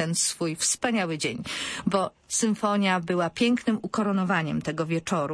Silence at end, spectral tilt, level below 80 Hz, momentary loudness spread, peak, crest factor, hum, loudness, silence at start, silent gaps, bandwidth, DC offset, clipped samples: 0 s; -4 dB/octave; -62 dBFS; 5 LU; -8 dBFS; 18 dB; none; -26 LUFS; 0 s; none; 11 kHz; under 0.1%; under 0.1%